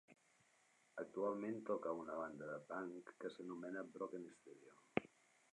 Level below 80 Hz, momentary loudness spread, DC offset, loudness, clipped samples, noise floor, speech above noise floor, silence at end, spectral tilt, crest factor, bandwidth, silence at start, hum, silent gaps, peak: -86 dBFS; 14 LU; under 0.1%; -48 LUFS; under 0.1%; -76 dBFS; 28 dB; 0.45 s; -6.5 dB/octave; 30 dB; 11 kHz; 0.1 s; none; none; -20 dBFS